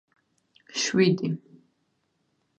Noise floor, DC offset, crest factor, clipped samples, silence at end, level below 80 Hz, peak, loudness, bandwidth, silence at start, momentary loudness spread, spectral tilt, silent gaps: -73 dBFS; under 0.1%; 20 dB; under 0.1%; 1.2 s; -74 dBFS; -10 dBFS; -25 LUFS; 9 kHz; 0.75 s; 13 LU; -4.5 dB/octave; none